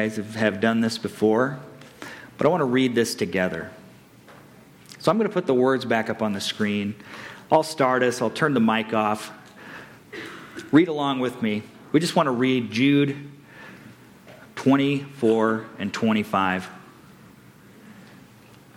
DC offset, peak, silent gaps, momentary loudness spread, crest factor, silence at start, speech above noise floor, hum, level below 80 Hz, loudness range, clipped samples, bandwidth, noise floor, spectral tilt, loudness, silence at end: under 0.1%; -6 dBFS; none; 19 LU; 18 dB; 0 s; 28 dB; none; -66 dBFS; 3 LU; under 0.1%; 16.5 kHz; -50 dBFS; -5.5 dB/octave; -23 LUFS; 0.75 s